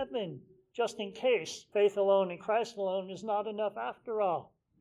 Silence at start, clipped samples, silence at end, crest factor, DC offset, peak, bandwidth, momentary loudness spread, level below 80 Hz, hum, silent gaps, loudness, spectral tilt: 0 s; under 0.1%; 0.35 s; 16 dB; under 0.1%; -16 dBFS; 12 kHz; 10 LU; -78 dBFS; none; none; -32 LUFS; -4.5 dB/octave